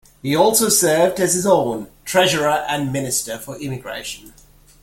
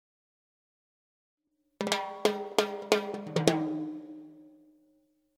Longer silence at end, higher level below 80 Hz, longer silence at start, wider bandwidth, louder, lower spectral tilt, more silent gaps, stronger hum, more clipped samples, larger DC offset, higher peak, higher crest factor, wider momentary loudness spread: second, 0.55 s vs 0.9 s; first, -52 dBFS vs -72 dBFS; second, 0.25 s vs 1.8 s; about the same, 17 kHz vs 17 kHz; first, -18 LUFS vs -31 LUFS; second, -3 dB/octave vs -4.5 dB/octave; neither; neither; neither; neither; about the same, -2 dBFS vs -4 dBFS; second, 18 dB vs 30 dB; about the same, 15 LU vs 14 LU